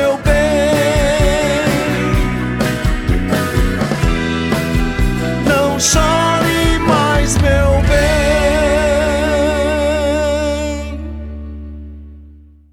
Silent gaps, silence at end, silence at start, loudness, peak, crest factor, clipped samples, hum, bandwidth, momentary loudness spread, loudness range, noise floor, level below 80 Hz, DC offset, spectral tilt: none; 0.35 s; 0 s; -14 LUFS; 0 dBFS; 14 dB; under 0.1%; none; 17.5 kHz; 10 LU; 4 LU; -40 dBFS; -22 dBFS; under 0.1%; -5 dB/octave